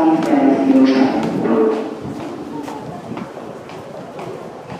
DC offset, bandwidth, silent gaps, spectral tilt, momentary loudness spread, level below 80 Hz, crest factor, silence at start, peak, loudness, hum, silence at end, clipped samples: under 0.1%; 9.8 kHz; none; -7 dB/octave; 19 LU; -56 dBFS; 16 dB; 0 s; -2 dBFS; -16 LUFS; none; 0 s; under 0.1%